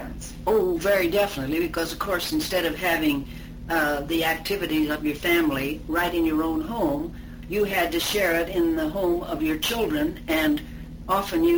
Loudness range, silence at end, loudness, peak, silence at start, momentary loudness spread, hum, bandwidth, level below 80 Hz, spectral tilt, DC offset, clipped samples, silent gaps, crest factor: 1 LU; 0 s; -24 LUFS; -10 dBFS; 0 s; 7 LU; none; over 20 kHz; -42 dBFS; -4.5 dB/octave; under 0.1%; under 0.1%; none; 14 dB